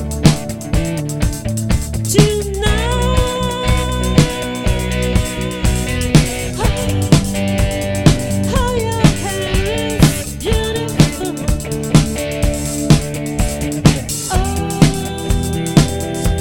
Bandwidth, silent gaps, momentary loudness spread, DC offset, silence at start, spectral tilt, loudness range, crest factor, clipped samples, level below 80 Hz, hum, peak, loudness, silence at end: 17.5 kHz; none; 6 LU; under 0.1%; 0 s; -5 dB/octave; 1 LU; 16 dB; 0.1%; -22 dBFS; none; 0 dBFS; -16 LUFS; 0 s